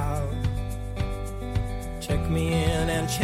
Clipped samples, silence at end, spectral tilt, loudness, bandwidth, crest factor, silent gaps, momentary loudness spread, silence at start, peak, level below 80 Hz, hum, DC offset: under 0.1%; 0 s; -5.5 dB/octave; -28 LUFS; 16 kHz; 16 dB; none; 9 LU; 0 s; -10 dBFS; -32 dBFS; none; under 0.1%